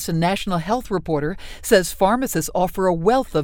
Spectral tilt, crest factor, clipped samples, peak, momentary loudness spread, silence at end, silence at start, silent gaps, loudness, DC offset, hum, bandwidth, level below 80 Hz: -5 dB/octave; 18 dB; under 0.1%; -2 dBFS; 6 LU; 0 s; 0 s; none; -20 LUFS; under 0.1%; none; over 20 kHz; -38 dBFS